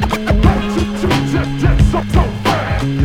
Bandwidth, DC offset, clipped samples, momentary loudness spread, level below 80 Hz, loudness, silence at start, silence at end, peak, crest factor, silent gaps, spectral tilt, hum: 16 kHz; under 0.1%; under 0.1%; 4 LU; -18 dBFS; -15 LUFS; 0 s; 0 s; 0 dBFS; 14 dB; none; -6.5 dB/octave; none